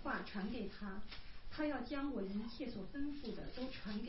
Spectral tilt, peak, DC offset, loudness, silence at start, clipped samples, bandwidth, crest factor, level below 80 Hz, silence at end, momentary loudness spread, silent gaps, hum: -4.5 dB/octave; -28 dBFS; 0.3%; -45 LUFS; 0 s; under 0.1%; 5.8 kHz; 16 dB; -56 dBFS; 0 s; 9 LU; none; none